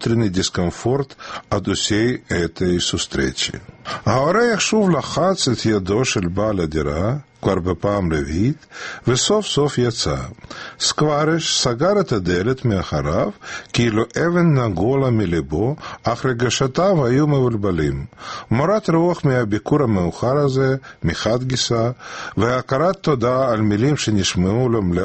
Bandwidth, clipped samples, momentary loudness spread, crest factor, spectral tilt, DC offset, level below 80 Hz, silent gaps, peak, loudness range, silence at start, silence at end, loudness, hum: 8.8 kHz; under 0.1%; 7 LU; 18 dB; -5 dB/octave; under 0.1%; -40 dBFS; none; -2 dBFS; 2 LU; 0 s; 0 s; -19 LUFS; none